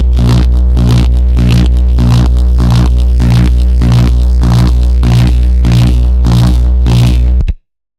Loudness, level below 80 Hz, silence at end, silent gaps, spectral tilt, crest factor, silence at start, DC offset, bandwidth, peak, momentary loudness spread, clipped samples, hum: -9 LUFS; -8 dBFS; 0.45 s; none; -7.5 dB/octave; 6 dB; 0 s; under 0.1%; 10 kHz; 0 dBFS; 2 LU; under 0.1%; 60 Hz at -10 dBFS